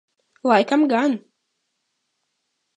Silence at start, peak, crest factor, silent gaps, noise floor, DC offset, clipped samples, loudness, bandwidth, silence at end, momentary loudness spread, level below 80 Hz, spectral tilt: 0.45 s; -2 dBFS; 20 dB; none; -75 dBFS; under 0.1%; under 0.1%; -19 LUFS; 9.6 kHz; 1.6 s; 10 LU; -80 dBFS; -5.5 dB/octave